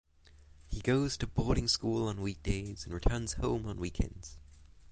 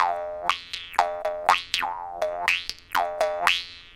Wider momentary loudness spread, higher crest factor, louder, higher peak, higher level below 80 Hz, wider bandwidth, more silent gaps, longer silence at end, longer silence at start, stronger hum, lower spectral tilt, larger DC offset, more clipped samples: first, 9 LU vs 6 LU; second, 20 dB vs 26 dB; second, -34 LUFS vs -25 LUFS; second, -14 dBFS vs 0 dBFS; first, -42 dBFS vs -56 dBFS; second, 10 kHz vs 17 kHz; neither; about the same, 0 s vs 0 s; first, 0.35 s vs 0 s; neither; first, -5 dB/octave vs -0.5 dB/octave; neither; neither